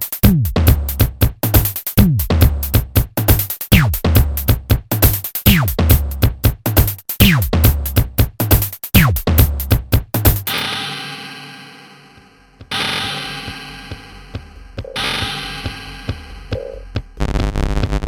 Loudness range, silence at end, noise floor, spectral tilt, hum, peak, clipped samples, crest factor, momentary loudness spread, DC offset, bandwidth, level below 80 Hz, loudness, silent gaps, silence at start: 11 LU; 0 s; -46 dBFS; -5 dB/octave; none; 0 dBFS; under 0.1%; 16 dB; 16 LU; under 0.1%; over 20 kHz; -22 dBFS; -16 LUFS; none; 0 s